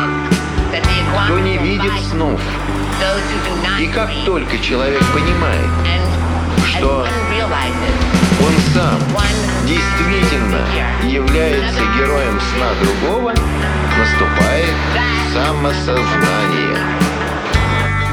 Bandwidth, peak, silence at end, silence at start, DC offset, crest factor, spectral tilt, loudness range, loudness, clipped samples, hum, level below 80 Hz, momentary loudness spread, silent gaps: 17.5 kHz; 0 dBFS; 0 s; 0 s; under 0.1%; 14 dB; -5.5 dB/octave; 2 LU; -15 LUFS; under 0.1%; none; -22 dBFS; 4 LU; none